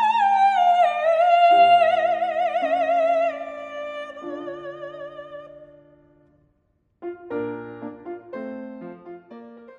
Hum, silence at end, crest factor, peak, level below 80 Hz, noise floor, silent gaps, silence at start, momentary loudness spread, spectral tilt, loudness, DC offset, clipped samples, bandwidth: none; 0.2 s; 16 dB; -6 dBFS; -70 dBFS; -68 dBFS; none; 0 s; 23 LU; -4.5 dB/octave; -19 LUFS; under 0.1%; under 0.1%; 8.2 kHz